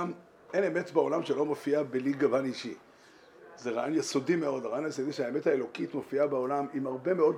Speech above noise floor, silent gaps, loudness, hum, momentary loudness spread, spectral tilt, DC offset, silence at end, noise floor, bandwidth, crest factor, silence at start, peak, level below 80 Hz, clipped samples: 27 dB; none; -31 LUFS; none; 8 LU; -5.5 dB/octave; under 0.1%; 0 s; -57 dBFS; 13 kHz; 18 dB; 0 s; -12 dBFS; -82 dBFS; under 0.1%